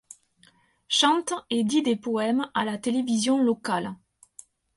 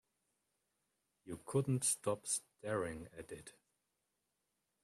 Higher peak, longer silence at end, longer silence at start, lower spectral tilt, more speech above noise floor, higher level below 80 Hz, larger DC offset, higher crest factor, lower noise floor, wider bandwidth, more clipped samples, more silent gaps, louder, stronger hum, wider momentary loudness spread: first, -8 dBFS vs -24 dBFS; second, 0.8 s vs 1.35 s; second, 0.9 s vs 1.25 s; about the same, -3.5 dB/octave vs -4.5 dB/octave; second, 37 dB vs 47 dB; about the same, -70 dBFS vs -72 dBFS; neither; about the same, 18 dB vs 20 dB; second, -61 dBFS vs -86 dBFS; second, 11.5 kHz vs 15 kHz; neither; neither; first, -25 LUFS vs -38 LUFS; neither; second, 7 LU vs 17 LU